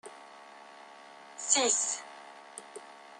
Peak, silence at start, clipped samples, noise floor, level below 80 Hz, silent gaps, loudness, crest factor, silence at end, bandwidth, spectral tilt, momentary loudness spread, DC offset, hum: -8 dBFS; 0.05 s; under 0.1%; -52 dBFS; under -90 dBFS; none; -28 LUFS; 28 dB; 0 s; 12 kHz; 1 dB/octave; 25 LU; under 0.1%; none